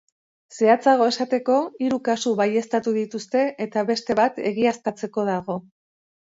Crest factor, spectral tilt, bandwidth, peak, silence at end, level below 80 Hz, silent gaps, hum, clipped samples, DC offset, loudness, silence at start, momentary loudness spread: 18 dB; -5 dB/octave; 8 kHz; -4 dBFS; 0.6 s; -68 dBFS; none; none; under 0.1%; under 0.1%; -22 LUFS; 0.5 s; 8 LU